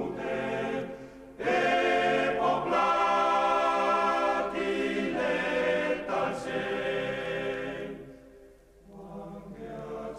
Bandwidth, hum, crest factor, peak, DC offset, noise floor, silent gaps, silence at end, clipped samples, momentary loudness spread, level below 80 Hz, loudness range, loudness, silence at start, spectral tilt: 13 kHz; none; 14 dB; -14 dBFS; under 0.1%; -55 dBFS; none; 0 s; under 0.1%; 18 LU; -58 dBFS; 9 LU; -28 LUFS; 0 s; -5 dB/octave